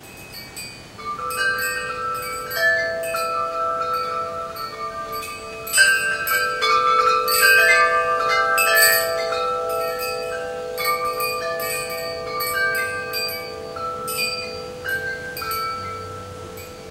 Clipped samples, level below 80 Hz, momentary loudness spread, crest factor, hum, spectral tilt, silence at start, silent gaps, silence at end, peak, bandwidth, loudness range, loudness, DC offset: under 0.1%; -54 dBFS; 16 LU; 22 dB; none; -0.5 dB/octave; 0 s; none; 0 s; 0 dBFS; 17 kHz; 9 LU; -20 LUFS; under 0.1%